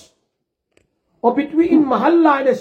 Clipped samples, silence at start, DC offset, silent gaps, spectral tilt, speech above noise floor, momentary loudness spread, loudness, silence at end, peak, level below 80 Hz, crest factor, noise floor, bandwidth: under 0.1%; 1.25 s; under 0.1%; none; -7 dB/octave; 60 dB; 6 LU; -15 LUFS; 0 s; -2 dBFS; -60 dBFS; 16 dB; -74 dBFS; 6.8 kHz